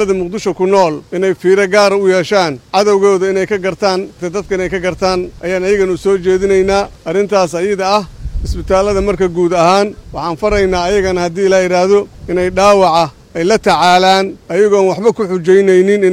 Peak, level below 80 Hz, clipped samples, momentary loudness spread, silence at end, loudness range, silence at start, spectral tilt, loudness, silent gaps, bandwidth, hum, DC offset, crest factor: 0 dBFS; -32 dBFS; under 0.1%; 9 LU; 0 s; 3 LU; 0 s; -5 dB/octave; -12 LUFS; none; 12.5 kHz; none; under 0.1%; 12 dB